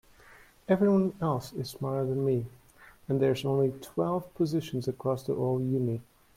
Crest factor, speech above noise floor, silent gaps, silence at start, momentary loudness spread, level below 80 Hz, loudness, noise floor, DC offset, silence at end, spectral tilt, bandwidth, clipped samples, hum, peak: 18 dB; 27 dB; none; 0.3 s; 9 LU; -62 dBFS; -30 LUFS; -56 dBFS; under 0.1%; 0.35 s; -8 dB/octave; 16.5 kHz; under 0.1%; none; -12 dBFS